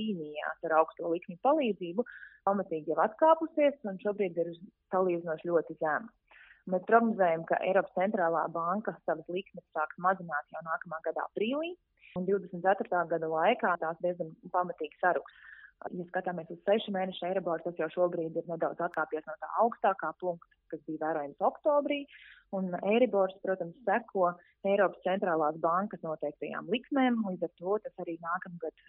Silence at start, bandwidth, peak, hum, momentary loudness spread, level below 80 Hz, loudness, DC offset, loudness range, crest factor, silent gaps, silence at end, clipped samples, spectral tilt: 0 s; 4.1 kHz; -10 dBFS; none; 10 LU; -78 dBFS; -32 LUFS; under 0.1%; 4 LU; 22 dB; none; 0.2 s; under 0.1%; -4.5 dB/octave